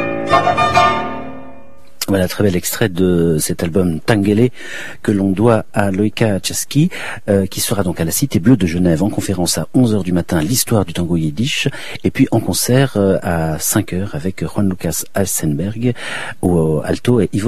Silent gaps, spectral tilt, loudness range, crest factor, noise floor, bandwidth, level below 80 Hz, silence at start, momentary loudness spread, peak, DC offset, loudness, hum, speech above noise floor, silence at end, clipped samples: none; -5 dB/octave; 2 LU; 16 dB; -43 dBFS; 15 kHz; -40 dBFS; 0 s; 8 LU; 0 dBFS; 3%; -16 LUFS; none; 28 dB; 0 s; under 0.1%